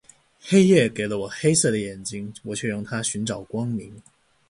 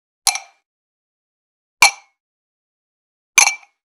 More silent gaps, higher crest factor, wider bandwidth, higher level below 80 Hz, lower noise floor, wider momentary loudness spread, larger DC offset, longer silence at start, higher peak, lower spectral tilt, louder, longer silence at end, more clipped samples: second, none vs 0.66-1.77 s, 2.20-3.33 s; about the same, 20 dB vs 22 dB; second, 11.5 kHz vs 14 kHz; first, -58 dBFS vs -68 dBFS; second, -47 dBFS vs under -90 dBFS; about the same, 15 LU vs 13 LU; neither; first, 0.45 s vs 0.25 s; second, -4 dBFS vs 0 dBFS; first, -4.5 dB/octave vs 3.5 dB/octave; second, -23 LUFS vs -14 LUFS; about the same, 0.5 s vs 0.4 s; neither